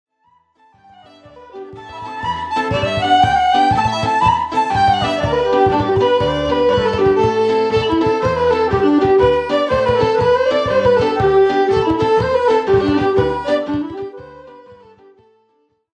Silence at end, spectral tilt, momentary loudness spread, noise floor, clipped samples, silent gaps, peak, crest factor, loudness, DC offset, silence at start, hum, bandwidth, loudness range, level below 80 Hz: 1.25 s; -6 dB/octave; 9 LU; -61 dBFS; under 0.1%; none; -2 dBFS; 14 dB; -15 LUFS; under 0.1%; 1.35 s; none; 10 kHz; 4 LU; -38 dBFS